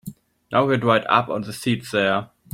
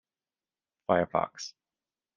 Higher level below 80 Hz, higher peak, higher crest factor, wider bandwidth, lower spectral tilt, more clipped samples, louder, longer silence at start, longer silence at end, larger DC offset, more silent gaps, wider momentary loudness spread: first, -60 dBFS vs -68 dBFS; first, -4 dBFS vs -10 dBFS; second, 18 dB vs 24 dB; first, 16.5 kHz vs 7.6 kHz; about the same, -5.5 dB/octave vs -5 dB/octave; neither; first, -21 LUFS vs -29 LUFS; second, 0.05 s vs 0.9 s; second, 0.3 s vs 0.65 s; neither; neither; second, 8 LU vs 15 LU